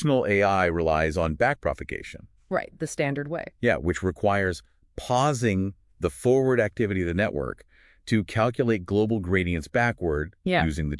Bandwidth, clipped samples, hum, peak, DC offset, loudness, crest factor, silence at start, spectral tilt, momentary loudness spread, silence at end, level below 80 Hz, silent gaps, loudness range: 12 kHz; under 0.1%; none; -8 dBFS; under 0.1%; -25 LUFS; 18 dB; 0 s; -6.5 dB/octave; 11 LU; 0 s; -46 dBFS; none; 2 LU